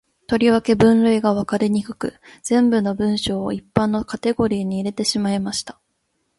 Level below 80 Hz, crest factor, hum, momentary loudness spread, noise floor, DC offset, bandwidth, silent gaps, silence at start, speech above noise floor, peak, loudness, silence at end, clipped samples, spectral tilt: -48 dBFS; 18 dB; none; 11 LU; -70 dBFS; under 0.1%; 11.5 kHz; none; 0.3 s; 51 dB; 0 dBFS; -19 LUFS; 0.65 s; under 0.1%; -5.5 dB/octave